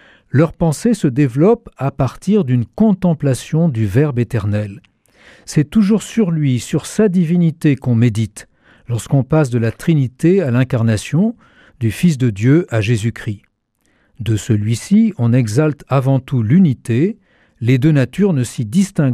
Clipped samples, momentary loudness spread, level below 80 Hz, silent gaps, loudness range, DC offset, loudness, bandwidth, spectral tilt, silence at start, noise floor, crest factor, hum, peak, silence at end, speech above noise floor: under 0.1%; 7 LU; -46 dBFS; none; 2 LU; under 0.1%; -16 LUFS; 14 kHz; -7.5 dB/octave; 0.35 s; -62 dBFS; 12 dB; none; -2 dBFS; 0 s; 48 dB